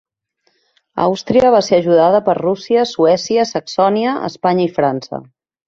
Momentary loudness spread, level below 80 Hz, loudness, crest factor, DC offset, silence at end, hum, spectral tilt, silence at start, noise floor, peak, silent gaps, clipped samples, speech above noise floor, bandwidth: 8 LU; -56 dBFS; -15 LUFS; 14 dB; under 0.1%; 0.45 s; none; -5.5 dB/octave; 0.95 s; -65 dBFS; -2 dBFS; none; under 0.1%; 51 dB; 7.6 kHz